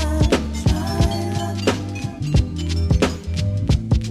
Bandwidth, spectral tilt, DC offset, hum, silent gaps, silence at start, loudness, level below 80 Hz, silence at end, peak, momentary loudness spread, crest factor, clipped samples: 13.5 kHz; -6 dB/octave; under 0.1%; none; none; 0 s; -21 LUFS; -26 dBFS; 0 s; -4 dBFS; 5 LU; 14 dB; under 0.1%